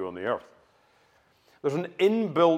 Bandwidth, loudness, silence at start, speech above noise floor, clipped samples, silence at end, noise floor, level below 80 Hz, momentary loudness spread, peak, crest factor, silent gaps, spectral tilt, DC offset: 13.5 kHz; -27 LUFS; 0 s; 39 dB; under 0.1%; 0 s; -64 dBFS; -76 dBFS; 9 LU; -8 dBFS; 20 dB; none; -7 dB/octave; under 0.1%